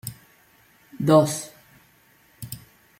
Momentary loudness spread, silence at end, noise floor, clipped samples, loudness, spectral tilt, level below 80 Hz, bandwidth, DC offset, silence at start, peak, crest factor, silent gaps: 23 LU; 0.4 s; -58 dBFS; under 0.1%; -21 LUFS; -6 dB/octave; -62 dBFS; 16.5 kHz; under 0.1%; 0.05 s; -4 dBFS; 22 dB; none